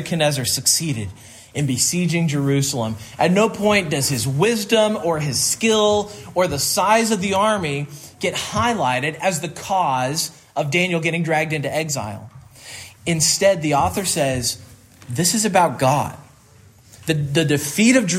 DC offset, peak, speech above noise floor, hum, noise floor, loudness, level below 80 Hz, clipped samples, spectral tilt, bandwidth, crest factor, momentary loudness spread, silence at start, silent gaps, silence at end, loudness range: under 0.1%; -2 dBFS; 30 dB; none; -49 dBFS; -19 LUFS; -52 dBFS; under 0.1%; -4 dB/octave; 16 kHz; 18 dB; 10 LU; 0 s; none; 0 s; 3 LU